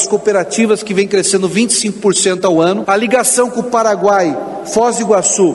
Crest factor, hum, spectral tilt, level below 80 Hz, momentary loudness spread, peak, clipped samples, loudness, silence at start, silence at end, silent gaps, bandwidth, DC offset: 12 dB; none; -3.5 dB/octave; -56 dBFS; 3 LU; 0 dBFS; under 0.1%; -12 LUFS; 0 s; 0 s; none; 12 kHz; under 0.1%